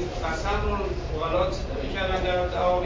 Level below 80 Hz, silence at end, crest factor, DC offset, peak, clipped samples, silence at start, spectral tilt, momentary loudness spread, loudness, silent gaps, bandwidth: -32 dBFS; 0 s; 16 dB; under 0.1%; -10 dBFS; under 0.1%; 0 s; -6 dB/octave; 5 LU; -27 LUFS; none; 7.6 kHz